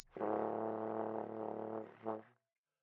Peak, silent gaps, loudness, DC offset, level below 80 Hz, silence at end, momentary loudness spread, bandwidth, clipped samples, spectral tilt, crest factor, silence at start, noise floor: -24 dBFS; none; -42 LUFS; under 0.1%; -84 dBFS; 0.55 s; 7 LU; 5 kHz; under 0.1%; -7 dB/octave; 20 dB; 0 s; -84 dBFS